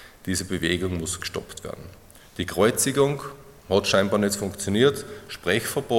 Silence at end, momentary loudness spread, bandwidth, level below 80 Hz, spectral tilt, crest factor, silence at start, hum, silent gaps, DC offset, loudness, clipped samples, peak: 0 s; 16 LU; 17 kHz; -54 dBFS; -4 dB/octave; 20 dB; 0 s; none; none; under 0.1%; -24 LUFS; under 0.1%; -4 dBFS